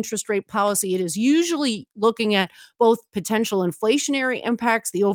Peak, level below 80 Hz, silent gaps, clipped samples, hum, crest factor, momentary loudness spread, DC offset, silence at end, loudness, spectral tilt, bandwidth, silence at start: -4 dBFS; -70 dBFS; none; under 0.1%; none; 18 dB; 5 LU; under 0.1%; 0 s; -21 LUFS; -3.5 dB/octave; 19.5 kHz; 0 s